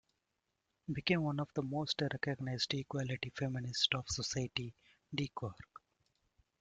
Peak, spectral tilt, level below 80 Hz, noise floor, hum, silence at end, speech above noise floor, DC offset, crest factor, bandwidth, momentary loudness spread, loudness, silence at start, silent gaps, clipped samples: -16 dBFS; -4.5 dB/octave; -66 dBFS; -86 dBFS; none; 0.95 s; 48 dB; under 0.1%; 24 dB; 9.2 kHz; 12 LU; -38 LUFS; 0.9 s; none; under 0.1%